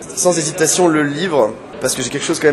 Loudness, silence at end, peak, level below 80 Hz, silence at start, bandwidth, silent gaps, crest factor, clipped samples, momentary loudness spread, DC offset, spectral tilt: -16 LUFS; 0 s; 0 dBFS; -52 dBFS; 0 s; 13.5 kHz; none; 16 dB; under 0.1%; 6 LU; under 0.1%; -3.5 dB/octave